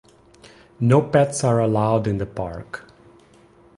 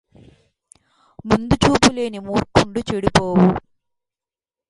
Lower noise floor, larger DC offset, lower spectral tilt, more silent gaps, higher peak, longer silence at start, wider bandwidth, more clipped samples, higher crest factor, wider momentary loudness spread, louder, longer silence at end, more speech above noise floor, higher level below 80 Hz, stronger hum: second, -52 dBFS vs under -90 dBFS; neither; first, -7 dB/octave vs -5 dB/octave; neither; second, -4 dBFS vs 0 dBFS; second, 0.8 s vs 1.25 s; about the same, 11.5 kHz vs 11.5 kHz; neither; about the same, 18 dB vs 20 dB; first, 17 LU vs 10 LU; about the same, -20 LUFS vs -18 LUFS; second, 0.95 s vs 1.1 s; second, 32 dB vs over 73 dB; second, -48 dBFS vs -38 dBFS; neither